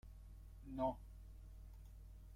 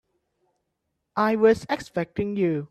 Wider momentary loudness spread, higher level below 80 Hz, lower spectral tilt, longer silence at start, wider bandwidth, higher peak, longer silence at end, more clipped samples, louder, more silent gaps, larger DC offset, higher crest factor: first, 17 LU vs 9 LU; about the same, -58 dBFS vs -58 dBFS; first, -8.5 dB/octave vs -7 dB/octave; second, 0.05 s vs 1.15 s; first, 16 kHz vs 13 kHz; second, -28 dBFS vs -8 dBFS; about the same, 0 s vs 0.05 s; neither; second, -49 LUFS vs -24 LUFS; neither; neither; about the same, 22 dB vs 18 dB